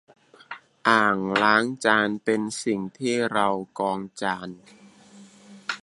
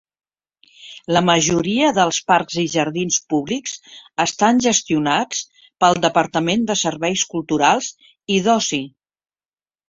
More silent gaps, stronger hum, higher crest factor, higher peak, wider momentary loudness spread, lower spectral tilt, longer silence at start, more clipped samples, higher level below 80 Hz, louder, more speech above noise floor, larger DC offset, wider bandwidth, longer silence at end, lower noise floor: neither; neither; about the same, 22 dB vs 18 dB; about the same, -2 dBFS vs -2 dBFS; first, 16 LU vs 13 LU; about the same, -4 dB/octave vs -3.5 dB/octave; second, 0.5 s vs 0.8 s; neither; second, -68 dBFS vs -56 dBFS; second, -23 LUFS vs -18 LUFS; second, 26 dB vs over 72 dB; neither; first, 11.5 kHz vs 7.8 kHz; second, 0.05 s vs 1 s; second, -50 dBFS vs under -90 dBFS